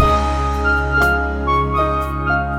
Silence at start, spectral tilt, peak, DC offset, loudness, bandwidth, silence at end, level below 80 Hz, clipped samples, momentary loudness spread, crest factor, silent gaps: 0 s; -6.5 dB/octave; 0 dBFS; under 0.1%; -17 LUFS; 16 kHz; 0 s; -22 dBFS; under 0.1%; 4 LU; 16 dB; none